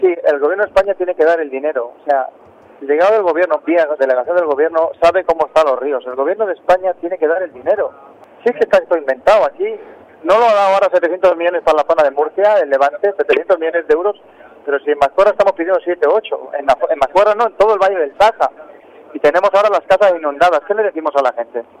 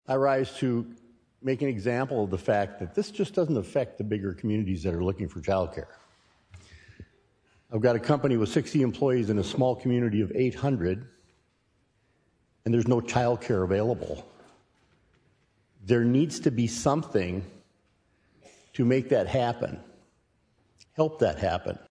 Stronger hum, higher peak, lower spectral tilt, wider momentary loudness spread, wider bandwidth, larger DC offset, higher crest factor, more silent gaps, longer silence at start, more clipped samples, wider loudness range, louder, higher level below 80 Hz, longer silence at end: neither; first, -2 dBFS vs -8 dBFS; second, -4.5 dB/octave vs -7 dB/octave; about the same, 8 LU vs 10 LU; about the same, 10.5 kHz vs 11 kHz; neither; second, 12 dB vs 20 dB; neither; about the same, 0 s vs 0.1 s; neither; about the same, 3 LU vs 4 LU; first, -14 LUFS vs -27 LUFS; about the same, -50 dBFS vs -54 dBFS; about the same, 0.2 s vs 0.1 s